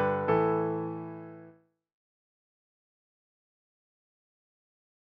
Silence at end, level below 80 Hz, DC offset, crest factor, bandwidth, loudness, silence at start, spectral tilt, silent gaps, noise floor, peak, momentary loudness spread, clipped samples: 3.7 s; -70 dBFS; under 0.1%; 20 dB; 5.2 kHz; -29 LUFS; 0 s; -7 dB/octave; none; -58 dBFS; -16 dBFS; 20 LU; under 0.1%